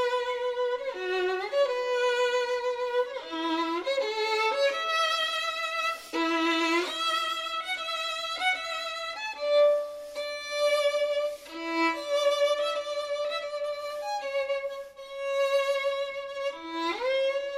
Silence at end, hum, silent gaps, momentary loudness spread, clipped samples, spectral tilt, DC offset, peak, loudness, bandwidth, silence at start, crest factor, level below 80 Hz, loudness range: 0 s; none; none; 8 LU; under 0.1%; -1 dB/octave; under 0.1%; -14 dBFS; -28 LUFS; 15.5 kHz; 0 s; 14 dB; -70 dBFS; 4 LU